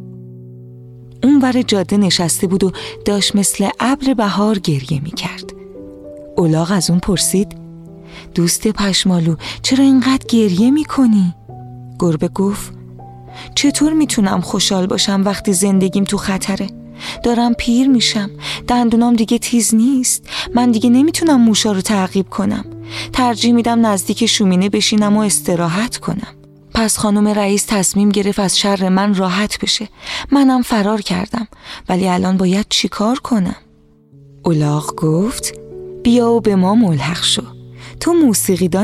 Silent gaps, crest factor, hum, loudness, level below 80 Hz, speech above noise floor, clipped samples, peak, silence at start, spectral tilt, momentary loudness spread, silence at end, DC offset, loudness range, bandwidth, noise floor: none; 14 dB; none; -14 LUFS; -40 dBFS; 34 dB; under 0.1%; -2 dBFS; 0 s; -4.5 dB/octave; 13 LU; 0 s; under 0.1%; 4 LU; 15 kHz; -48 dBFS